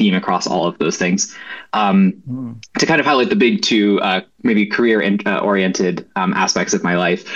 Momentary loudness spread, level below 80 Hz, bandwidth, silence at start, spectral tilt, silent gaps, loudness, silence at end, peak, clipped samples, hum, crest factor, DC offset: 7 LU; -58 dBFS; 7.8 kHz; 0 s; -4.5 dB/octave; none; -16 LUFS; 0 s; -2 dBFS; under 0.1%; none; 14 dB; 0.1%